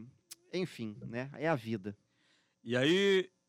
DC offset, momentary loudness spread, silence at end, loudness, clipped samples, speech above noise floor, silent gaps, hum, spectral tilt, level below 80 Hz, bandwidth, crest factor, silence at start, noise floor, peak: under 0.1%; 21 LU; 0.2 s; -34 LUFS; under 0.1%; 40 dB; none; none; -5.5 dB/octave; -78 dBFS; 15.5 kHz; 18 dB; 0 s; -73 dBFS; -16 dBFS